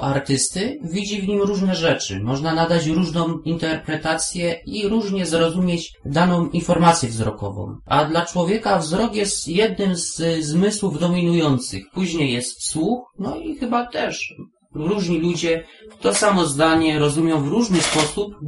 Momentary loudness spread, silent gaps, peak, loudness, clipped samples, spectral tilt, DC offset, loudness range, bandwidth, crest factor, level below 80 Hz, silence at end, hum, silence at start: 8 LU; none; 0 dBFS; -20 LUFS; under 0.1%; -4.5 dB/octave; under 0.1%; 4 LU; 11.5 kHz; 20 dB; -46 dBFS; 0 s; none; 0 s